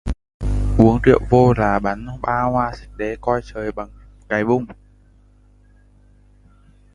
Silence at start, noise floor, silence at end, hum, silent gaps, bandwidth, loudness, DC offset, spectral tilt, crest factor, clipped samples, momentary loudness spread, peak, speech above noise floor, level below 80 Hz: 0.05 s; -51 dBFS; 2.2 s; 50 Hz at -40 dBFS; 0.34-0.40 s; 11 kHz; -19 LUFS; under 0.1%; -8.5 dB/octave; 20 dB; under 0.1%; 15 LU; 0 dBFS; 34 dB; -30 dBFS